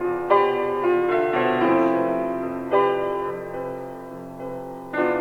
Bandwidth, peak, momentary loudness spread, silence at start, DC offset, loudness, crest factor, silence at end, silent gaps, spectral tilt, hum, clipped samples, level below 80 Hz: 6.4 kHz; -4 dBFS; 15 LU; 0 s; under 0.1%; -22 LUFS; 18 dB; 0 s; none; -7 dB/octave; none; under 0.1%; -56 dBFS